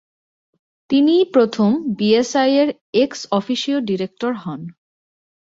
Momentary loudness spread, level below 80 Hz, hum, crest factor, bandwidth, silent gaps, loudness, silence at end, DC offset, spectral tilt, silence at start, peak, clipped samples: 10 LU; -62 dBFS; none; 16 dB; 7.8 kHz; 2.81-2.93 s; -18 LUFS; 0.9 s; under 0.1%; -5.5 dB/octave; 0.9 s; -2 dBFS; under 0.1%